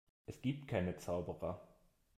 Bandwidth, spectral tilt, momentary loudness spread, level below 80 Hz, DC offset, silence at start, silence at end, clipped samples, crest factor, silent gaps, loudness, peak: 15.5 kHz; -7 dB/octave; 10 LU; -66 dBFS; under 0.1%; 0.3 s; 0.5 s; under 0.1%; 20 dB; none; -42 LUFS; -24 dBFS